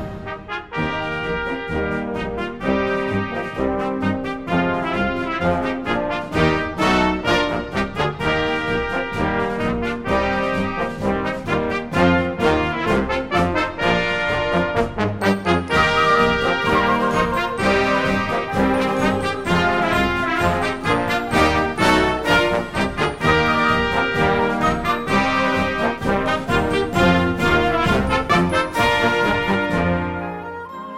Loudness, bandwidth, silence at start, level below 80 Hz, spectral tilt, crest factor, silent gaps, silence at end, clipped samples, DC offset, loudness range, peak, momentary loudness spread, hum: -19 LUFS; 16 kHz; 0 s; -36 dBFS; -5.5 dB/octave; 18 dB; none; 0 s; under 0.1%; under 0.1%; 4 LU; -2 dBFS; 7 LU; none